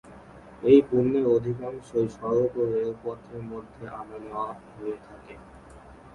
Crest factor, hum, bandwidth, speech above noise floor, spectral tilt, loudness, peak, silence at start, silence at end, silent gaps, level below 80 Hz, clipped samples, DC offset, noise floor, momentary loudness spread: 22 dB; none; 10 kHz; 22 dB; -8.5 dB/octave; -25 LUFS; -4 dBFS; 0.05 s; 0.05 s; none; -56 dBFS; under 0.1%; under 0.1%; -48 dBFS; 21 LU